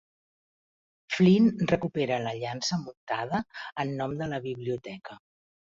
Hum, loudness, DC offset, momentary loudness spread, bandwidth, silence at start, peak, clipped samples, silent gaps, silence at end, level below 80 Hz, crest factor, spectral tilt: none; -28 LUFS; under 0.1%; 14 LU; 7.6 kHz; 1.1 s; -10 dBFS; under 0.1%; 2.97-3.07 s; 0.6 s; -62 dBFS; 20 dB; -6 dB/octave